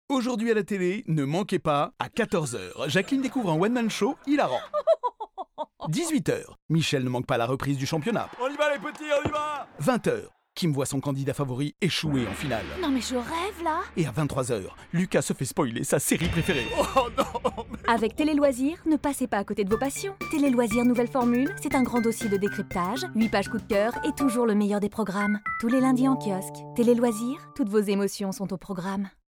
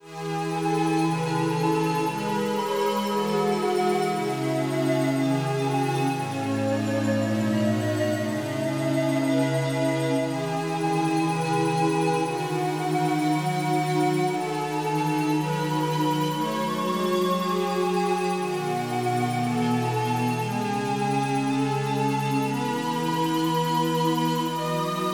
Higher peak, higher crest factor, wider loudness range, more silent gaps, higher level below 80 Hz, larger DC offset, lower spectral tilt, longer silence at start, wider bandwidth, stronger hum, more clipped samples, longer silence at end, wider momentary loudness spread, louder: about the same, -10 dBFS vs -12 dBFS; about the same, 16 dB vs 12 dB; about the same, 3 LU vs 1 LU; first, 6.62-6.69 s vs none; first, -50 dBFS vs -76 dBFS; neither; about the same, -5.5 dB/octave vs -6 dB/octave; about the same, 0.1 s vs 0.05 s; about the same, over 20 kHz vs over 20 kHz; neither; neither; first, 0.3 s vs 0 s; first, 8 LU vs 3 LU; about the same, -26 LUFS vs -25 LUFS